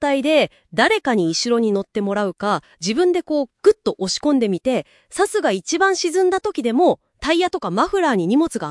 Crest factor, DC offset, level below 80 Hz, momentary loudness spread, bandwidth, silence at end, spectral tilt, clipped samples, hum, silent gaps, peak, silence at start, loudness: 18 dB; under 0.1%; -54 dBFS; 6 LU; 12 kHz; 0 s; -4 dB/octave; under 0.1%; none; none; 0 dBFS; 0 s; -19 LUFS